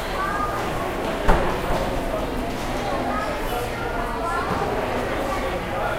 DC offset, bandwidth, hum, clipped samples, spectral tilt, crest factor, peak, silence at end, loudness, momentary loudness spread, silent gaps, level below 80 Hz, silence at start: under 0.1%; 16 kHz; none; under 0.1%; -5 dB/octave; 22 dB; -2 dBFS; 0 s; -25 LUFS; 4 LU; none; -30 dBFS; 0 s